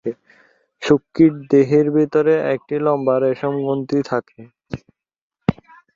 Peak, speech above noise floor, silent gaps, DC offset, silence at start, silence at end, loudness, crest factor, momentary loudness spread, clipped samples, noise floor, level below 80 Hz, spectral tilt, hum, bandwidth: -2 dBFS; 42 dB; 5.18-5.30 s; under 0.1%; 0.05 s; 0.45 s; -18 LUFS; 18 dB; 17 LU; under 0.1%; -59 dBFS; -52 dBFS; -8 dB/octave; none; 7.4 kHz